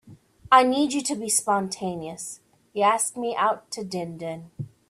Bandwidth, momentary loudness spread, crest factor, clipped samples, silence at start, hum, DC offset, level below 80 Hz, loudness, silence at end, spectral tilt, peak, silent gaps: 15.5 kHz; 18 LU; 22 dB; under 0.1%; 0.05 s; none; under 0.1%; -66 dBFS; -24 LUFS; 0.2 s; -3 dB/octave; -4 dBFS; none